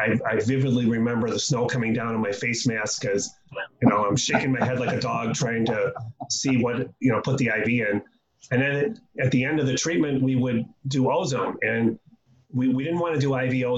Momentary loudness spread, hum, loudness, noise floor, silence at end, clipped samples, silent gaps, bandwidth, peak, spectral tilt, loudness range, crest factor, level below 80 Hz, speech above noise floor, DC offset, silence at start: 5 LU; none; -24 LUFS; -53 dBFS; 0 s; under 0.1%; none; 8.4 kHz; -4 dBFS; -5 dB/octave; 1 LU; 20 dB; -60 dBFS; 29 dB; under 0.1%; 0 s